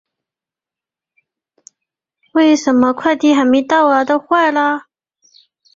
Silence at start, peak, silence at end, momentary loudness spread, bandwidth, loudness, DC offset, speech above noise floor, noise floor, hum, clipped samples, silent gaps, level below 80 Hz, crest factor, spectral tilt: 2.35 s; 0 dBFS; 0.95 s; 5 LU; 7.6 kHz; -13 LUFS; under 0.1%; 76 dB; -88 dBFS; none; under 0.1%; none; -60 dBFS; 16 dB; -3.5 dB/octave